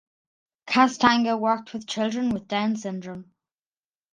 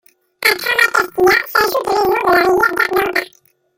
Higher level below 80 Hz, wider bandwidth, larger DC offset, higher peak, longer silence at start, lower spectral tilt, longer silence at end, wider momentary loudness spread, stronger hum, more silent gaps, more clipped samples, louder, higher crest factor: second, -64 dBFS vs -48 dBFS; second, 9.6 kHz vs 17 kHz; neither; about the same, -2 dBFS vs 0 dBFS; first, 0.65 s vs 0.4 s; first, -4.5 dB/octave vs -2.5 dB/octave; first, 0.9 s vs 0.55 s; first, 15 LU vs 4 LU; neither; neither; neither; second, -23 LUFS vs -14 LUFS; first, 22 dB vs 16 dB